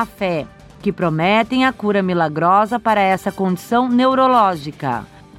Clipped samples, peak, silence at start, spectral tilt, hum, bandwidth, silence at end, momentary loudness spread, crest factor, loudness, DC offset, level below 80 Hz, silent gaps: under 0.1%; -2 dBFS; 0 s; -6.5 dB/octave; none; 15.5 kHz; 0 s; 11 LU; 16 dB; -17 LUFS; under 0.1%; -50 dBFS; none